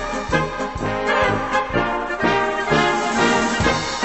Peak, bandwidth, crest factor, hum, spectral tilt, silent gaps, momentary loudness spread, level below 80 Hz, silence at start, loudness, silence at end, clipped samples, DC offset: -4 dBFS; 8.4 kHz; 16 dB; none; -4 dB/octave; none; 5 LU; -38 dBFS; 0 s; -19 LUFS; 0 s; under 0.1%; 0.2%